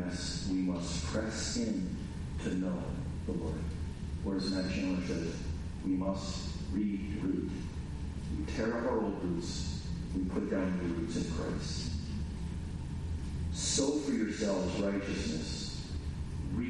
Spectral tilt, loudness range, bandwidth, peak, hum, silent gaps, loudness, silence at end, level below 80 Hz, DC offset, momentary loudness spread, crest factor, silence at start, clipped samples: -5.5 dB/octave; 3 LU; 11.5 kHz; -18 dBFS; none; none; -36 LUFS; 0 s; -44 dBFS; under 0.1%; 7 LU; 18 dB; 0 s; under 0.1%